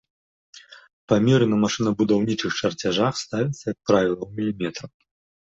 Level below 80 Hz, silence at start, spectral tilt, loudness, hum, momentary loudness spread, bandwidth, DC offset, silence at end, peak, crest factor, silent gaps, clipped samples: -56 dBFS; 0.7 s; -5.5 dB/octave; -22 LUFS; none; 9 LU; 7.8 kHz; under 0.1%; 0.55 s; -4 dBFS; 18 dB; 0.93-1.08 s; under 0.1%